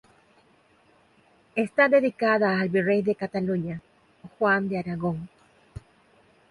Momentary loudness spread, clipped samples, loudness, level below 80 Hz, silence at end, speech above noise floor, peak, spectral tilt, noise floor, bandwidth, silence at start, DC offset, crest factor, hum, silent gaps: 25 LU; under 0.1%; -24 LUFS; -60 dBFS; 0.75 s; 37 dB; -8 dBFS; -8 dB/octave; -61 dBFS; 11.5 kHz; 1.55 s; under 0.1%; 18 dB; none; none